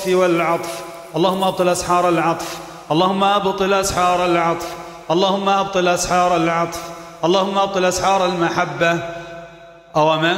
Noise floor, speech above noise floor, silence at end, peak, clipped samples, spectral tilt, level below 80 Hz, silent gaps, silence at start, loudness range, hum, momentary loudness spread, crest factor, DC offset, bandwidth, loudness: -41 dBFS; 24 dB; 0 s; -2 dBFS; under 0.1%; -4 dB/octave; -46 dBFS; none; 0 s; 1 LU; none; 13 LU; 14 dB; under 0.1%; 16 kHz; -17 LUFS